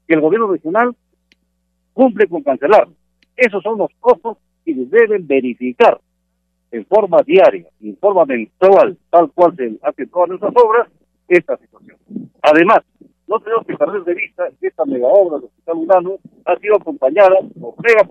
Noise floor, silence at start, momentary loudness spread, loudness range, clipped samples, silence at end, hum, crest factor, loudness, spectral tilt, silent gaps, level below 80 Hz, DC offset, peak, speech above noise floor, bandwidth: -67 dBFS; 0.1 s; 15 LU; 3 LU; under 0.1%; 0.05 s; none; 14 dB; -14 LUFS; -6.5 dB/octave; none; -62 dBFS; under 0.1%; 0 dBFS; 54 dB; 8.2 kHz